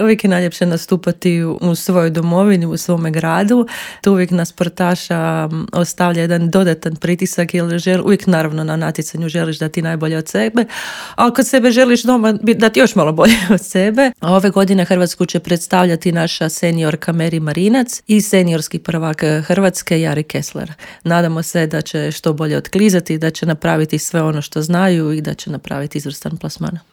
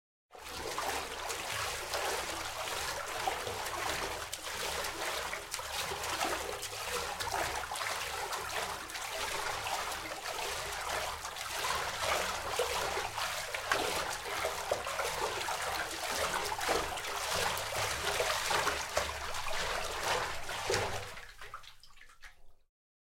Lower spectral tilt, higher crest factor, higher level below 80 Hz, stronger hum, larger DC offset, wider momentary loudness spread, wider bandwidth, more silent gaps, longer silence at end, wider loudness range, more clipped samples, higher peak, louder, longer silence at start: first, -5.5 dB/octave vs -1.5 dB/octave; second, 14 dB vs 26 dB; about the same, -50 dBFS vs -54 dBFS; neither; neither; first, 9 LU vs 6 LU; about the same, 18 kHz vs 16.5 kHz; neither; second, 0.15 s vs 0.6 s; about the same, 5 LU vs 3 LU; neither; first, 0 dBFS vs -12 dBFS; first, -15 LUFS vs -35 LUFS; second, 0 s vs 0.3 s